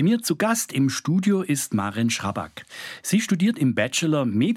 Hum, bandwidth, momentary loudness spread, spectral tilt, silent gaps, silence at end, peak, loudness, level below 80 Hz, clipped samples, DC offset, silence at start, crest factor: none; 16 kHz; 10 LU; -5 dB/octave; none; 0 s; -6 dBFS; -23 LUFS; -66 dBFS; under 0.1%; under 0.1%; 0 s; 16 dB